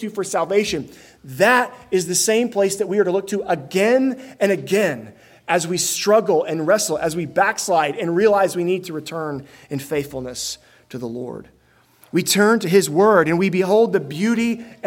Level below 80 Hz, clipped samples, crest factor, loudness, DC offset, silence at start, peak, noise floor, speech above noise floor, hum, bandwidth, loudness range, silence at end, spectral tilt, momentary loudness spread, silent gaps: -58 dBFS; under 0.1%; 18 dB; -19 LUFS; under 0.1%; 0 s; -2 dBFS; -54 dBFS; 35 dB; none; 17 kHz; 6 LU; 0 s; -4 dB/octave; 14 LU; none